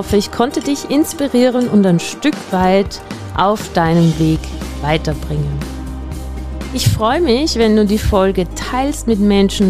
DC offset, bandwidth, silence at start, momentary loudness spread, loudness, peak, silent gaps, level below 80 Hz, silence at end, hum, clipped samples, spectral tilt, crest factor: 0.7%; 15.5 kHz; 0 s; 13 LU; -15 LUFS; -2 dBFS; none; -28 dBFS; 0 s; none; under 0.1%; -6 dB/octave; 12 dB